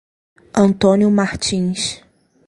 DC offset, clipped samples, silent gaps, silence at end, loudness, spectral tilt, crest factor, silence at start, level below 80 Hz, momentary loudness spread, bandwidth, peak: under 0.1%; under 0.1%; none; 0.5 s; -16 LUFS; -5 dB/octave; 16 dB; 0.55 s; -46 dBFS; 10 LU; 11.5 kHz; 0 dBFS